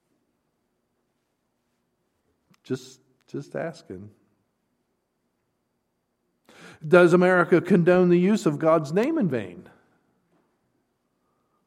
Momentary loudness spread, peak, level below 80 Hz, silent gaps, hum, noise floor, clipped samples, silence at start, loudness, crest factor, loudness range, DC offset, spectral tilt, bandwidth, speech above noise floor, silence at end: 22 LU; -2 dBFS; -70 dBFS; none; none; -75 dBFS; under 0.1%; 2.7 s; -20 LUFS; 22 dB; 21 LU; under 0.1%; -7.5 dB/octave; 10.5 kHz; 54 dB; 2.05 s